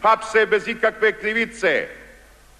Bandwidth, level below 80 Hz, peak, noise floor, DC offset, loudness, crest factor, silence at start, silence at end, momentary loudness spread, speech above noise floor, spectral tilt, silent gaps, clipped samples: 12.5 kHz; -54 dBFS; -6 dBFS; -48 dBFS; under 0.1%; -20 LUFS; 14 dB; 0 s; 0.55 s; 5 LU; 28 dB; -3.5 dB/octave; none; under 0.1%